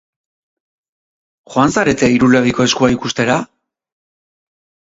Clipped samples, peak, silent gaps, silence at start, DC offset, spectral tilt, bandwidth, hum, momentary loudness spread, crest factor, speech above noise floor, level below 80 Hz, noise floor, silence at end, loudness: under 0.1%; 0 dBFS; none; 1.5 s; under 0.1%; -4.5 dB/octave; 8 kHz; none; 7 LU; 16 dB; over 77 dB; -46 dBFS; under -90 dBFS; 1.4 s; -14 LUFS